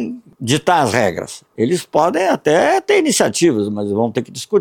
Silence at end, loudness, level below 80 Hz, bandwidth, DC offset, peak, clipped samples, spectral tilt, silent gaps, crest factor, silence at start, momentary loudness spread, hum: 0 s; -16 LUFS; -56 dBFS; 18 kHz; under 0.1%; -2 dBFS; under 0.1%; -4.5 dB/octave; none; 14 dB; 0 s; 10 LU; none